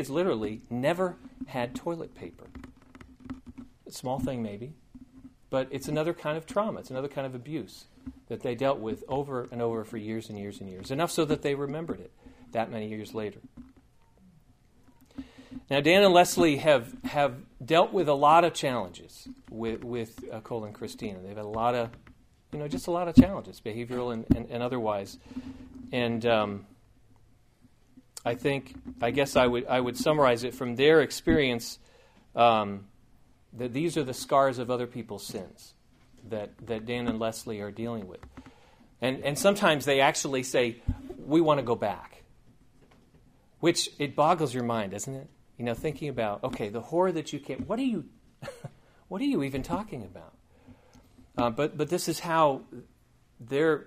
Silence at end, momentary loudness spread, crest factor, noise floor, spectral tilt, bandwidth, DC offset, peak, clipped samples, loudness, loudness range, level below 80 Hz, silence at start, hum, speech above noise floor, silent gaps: 0.05 s; 20 LU; 26 dB; -61 dBFS; -5 dB/octave; 15.5 kHz; under 0.1%; -4 dBFS; under 0.1%; -28 LUFS; 10 LU; -52 dBFS; 0 s; none; 33 dB; none